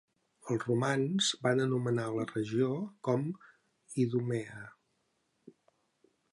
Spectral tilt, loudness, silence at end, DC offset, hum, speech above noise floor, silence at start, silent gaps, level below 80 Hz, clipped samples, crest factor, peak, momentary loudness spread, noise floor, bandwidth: -5.5 dB/octave; -33 LUFS; 0.85 s; under 0.1%; none; 46 dB; 0.45 s; none; -76 dBFS; under 0.1%; 18 dB; -16 dBFS; 15 LU; -78 dBFS; 11.5 kHz